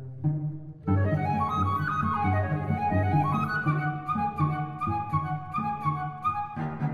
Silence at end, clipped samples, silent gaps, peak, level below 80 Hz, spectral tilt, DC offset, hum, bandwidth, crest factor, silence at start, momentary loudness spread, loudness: 0 s; under 0.1%; none; -14 dBFS; -54 dBFS; -9 dB/octave; under 0.1%; none; 6.6 kHz; 14 dB; 0 s; 6 LU; -28 LUFS